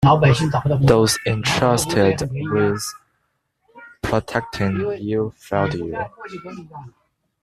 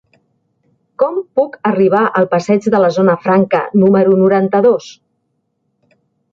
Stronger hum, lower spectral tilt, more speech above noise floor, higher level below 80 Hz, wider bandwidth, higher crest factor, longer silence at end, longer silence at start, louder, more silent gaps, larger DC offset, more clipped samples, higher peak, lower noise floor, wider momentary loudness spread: neither; second, -5.5 dB/octave vs -8 dB/octave; second, 51 dB vs 55 dB; first, -44 dBFS vs -60 dBFS; first, 14 kHz vs 7.6 kHz; first, 18 dB vs 12 dB; second, 0.55 s vs 1.4 s; second, 0 s vs 1 s; second, -19 LUFS vs -13 LUFS; neither; neither; neither; about the same, -2 dBFS vs -2 dBFS; about the same, -70 dBFS vs -67 dBFS; first, 19 LU vs 7 LU